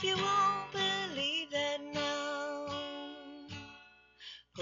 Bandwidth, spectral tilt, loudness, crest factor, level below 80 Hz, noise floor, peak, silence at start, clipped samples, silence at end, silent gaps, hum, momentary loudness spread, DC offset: 7.6 kHz; -1 dB/octave; -34 LUFS; 16 dB; -72 dBFS; -59 dBFS; -20 dBFS; 0 s; under 0.1%; 0 s; none; 60 Hz at -70 dBFS; 19 LU; under 0.1%